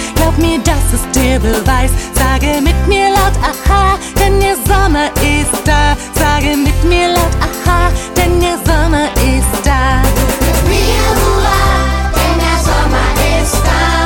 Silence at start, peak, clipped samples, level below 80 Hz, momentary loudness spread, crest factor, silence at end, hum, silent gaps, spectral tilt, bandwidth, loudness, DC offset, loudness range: 0 s; 0 dBFS; under 0.1%; -14 dBFS; 2 LU; 10 dB; 0 s; none; none; -4.5 dB/octave; 19.5 kHz; -12 LUFS; under 0.1%; 1 LU